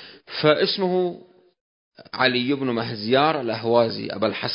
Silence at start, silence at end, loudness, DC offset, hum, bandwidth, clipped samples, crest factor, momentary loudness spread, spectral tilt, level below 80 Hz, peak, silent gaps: 0 s; 0 s; -22 LUFS; under 0.1%; none; 5.4 kHz; under 0.1%; 20 dB; 8 LU; -9.5 dB/octave; -66 dBFS; -2 dBFS; 1.61-1.91 s